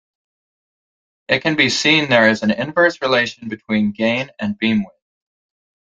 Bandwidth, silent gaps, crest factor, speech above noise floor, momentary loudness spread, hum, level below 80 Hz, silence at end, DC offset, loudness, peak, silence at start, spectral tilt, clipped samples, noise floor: 8 kHz; none; 20 dB; over 73 dB; 9 LU; none; -58 dBFS; 1 s; under 0.1%; -16 LUFS; 0 dBFS; 1.3 s; -4 dB/octave; under 0.1%; under -90 dBFS